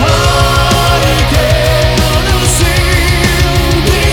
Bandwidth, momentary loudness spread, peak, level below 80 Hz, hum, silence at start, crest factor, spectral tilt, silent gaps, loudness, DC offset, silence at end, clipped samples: over 20 kHz; 2 LU; 0 dBFS; -14 dBFS; none; 0 s; 8 dB; -4 dB/octave; none; -9 LUFS; under 0.1%; 0 s; under 0.1%